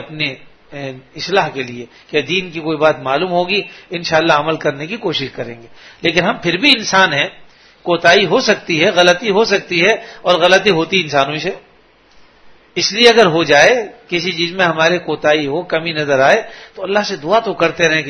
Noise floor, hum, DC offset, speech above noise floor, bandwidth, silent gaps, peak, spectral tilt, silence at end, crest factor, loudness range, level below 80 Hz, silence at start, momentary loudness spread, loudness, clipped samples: -49 dBFS; none; under 0.1%; 34 dB; 11 kHz; none; 0 dBFS; -3.5 dB/octave; 0 s; 14 dB; 5 LU; -52 dBFS; 0 s; 15 LU; -14 LUFS; 0.1%